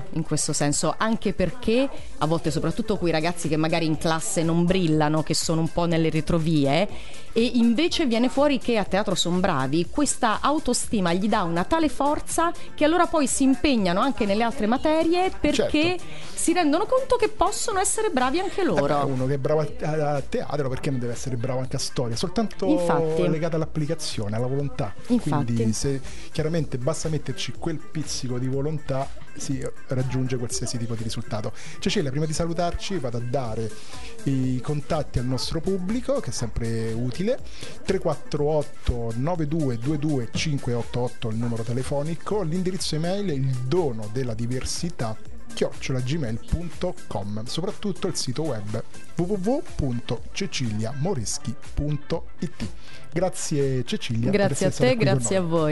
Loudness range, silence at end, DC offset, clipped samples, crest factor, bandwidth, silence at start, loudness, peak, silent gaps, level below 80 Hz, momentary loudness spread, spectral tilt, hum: 6 LU; 0 s; 3%; under 0.1%; 20 dB; 11.5 kHz; 0 s; -25 LUFS; -4 dBFS; none; -42 dBFS; 9 LU; -5 dB/octave; none